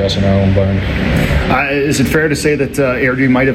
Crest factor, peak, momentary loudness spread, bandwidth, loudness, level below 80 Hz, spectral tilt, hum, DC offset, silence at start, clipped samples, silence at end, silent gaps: 10 dB; -2 dBFS; 3 LU; 16 kHz; -13 LUFS; -24 dBFS; -6 dB/octave; none; under 0.1%; 0 s; under 0.1%; 0 s; none